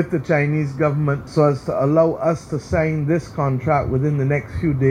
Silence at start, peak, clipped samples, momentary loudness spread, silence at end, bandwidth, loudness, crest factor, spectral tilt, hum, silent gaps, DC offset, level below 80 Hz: 0 s; -4 dBFS; under 0.1%; 5 LU; 0 s; 9.8 kHz; -20 LUFS; 16 dB; -8.5 dB/octave; none; none; under 0.1%; -40 dBFS